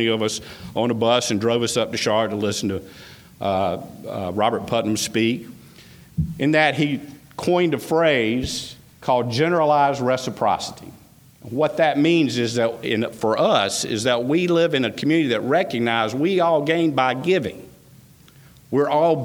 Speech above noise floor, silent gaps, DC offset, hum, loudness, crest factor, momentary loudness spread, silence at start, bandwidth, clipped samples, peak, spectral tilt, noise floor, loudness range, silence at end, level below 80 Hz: 28 dB; none; under 0.1%; none; -21 LUFS; 18 dB; 12 LU; 0 s; over 20 kHz; under 0.1%; -2 dBFS; -4.5 dB/octave; -49 dBFS; 4 LU; 0 s; -50 dBFS